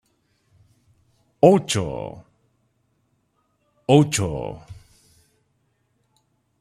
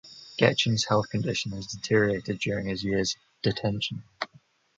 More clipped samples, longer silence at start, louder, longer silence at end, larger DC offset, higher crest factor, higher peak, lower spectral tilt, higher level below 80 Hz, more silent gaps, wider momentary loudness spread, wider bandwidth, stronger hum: neither; first, 1.45 s vs 0.05 s; first, -20 LUFS vs -27 LUFS; first, 1.9 s vs 0.5 s; neither; about the same, 22 dB vs 22 dB; first, -2 dBFS vs -6 dBFS; about the same, -5.5 dB/octave vs -4.5 dB/octave; about the same, -52 dBFS vs -54 dBFS; neither; first, 18 LU vs 12 LU; first, 14 kHz vs 9.2 kHz; neither